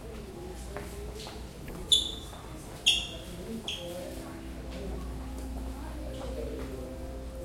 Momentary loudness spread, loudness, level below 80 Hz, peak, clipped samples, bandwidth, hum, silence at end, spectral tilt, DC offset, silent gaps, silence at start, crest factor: 17 LU; -34 LUFS; -42 dBFS; -10 dBFS; under 0.1%; 16.5 kHz; none; 0 s; -3 dB/octave; under 0.1%; none; 0 s; 26 dB